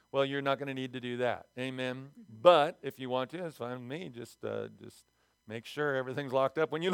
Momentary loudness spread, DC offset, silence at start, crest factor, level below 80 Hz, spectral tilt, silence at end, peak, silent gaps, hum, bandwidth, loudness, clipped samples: 16 LU; under 0.1%; 0.15 s; 24 dB; -80 dBFS; -6 dB/octave; 0 s; -8 dBFS; none; none; 16.5 kHz; -33 LUFS; under 0.1%